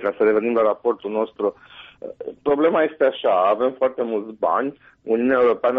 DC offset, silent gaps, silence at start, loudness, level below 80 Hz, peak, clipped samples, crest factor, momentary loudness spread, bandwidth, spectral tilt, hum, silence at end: under 0.1%; none; 0 s; -20 LUFS; -62 dBFS; -8 dBFS; under 0.1%; 12 dB; 12 LU; 4.6 kHz; -3.5 dB/octave; none; 0 s